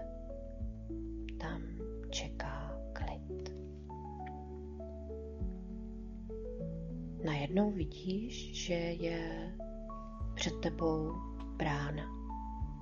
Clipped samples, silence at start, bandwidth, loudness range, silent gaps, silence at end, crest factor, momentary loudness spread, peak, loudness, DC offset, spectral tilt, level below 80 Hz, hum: under 0.1%; 0 s; 7.4 kHz; 7 LU; none; 0 s; 20 dB; 11 LU; -20 dBFS; -41 LUFS; under 0.1%; -5.5 dB/octave; -46 dBFS; none